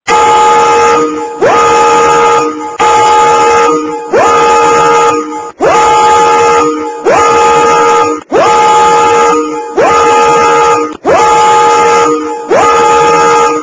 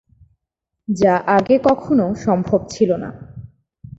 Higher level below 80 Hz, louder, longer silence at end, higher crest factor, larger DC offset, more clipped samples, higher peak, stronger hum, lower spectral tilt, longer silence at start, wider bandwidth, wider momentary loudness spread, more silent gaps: first, -40 dBFS vs -48 dBFS; first, -6 LUFS vs -17 LUFS; second, 0 s vs 0.5 s; second, 6 dB vs 16 dB; neither; first, 1% vs under 0.1%; about the same, 0 dBFS vs -2 dBFS; neither; second, -3 dB/octave vs -7 dB/octave; second, 0.05 s vs 0.9 s; about the same, 8 kHz vs 8 kHz; second, 6 LU vs 18 LU; neither